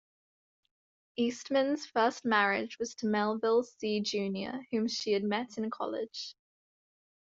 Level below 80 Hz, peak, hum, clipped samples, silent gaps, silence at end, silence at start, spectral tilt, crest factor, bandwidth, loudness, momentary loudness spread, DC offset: -78 dBFS; -12 dBFS; none; under 0.1%; none; 0.95 s; 1.2 s; -4.5 dB/octave; 20 dB; 7.8 kHz; -32 LUFS; 10 LU; under 0.1%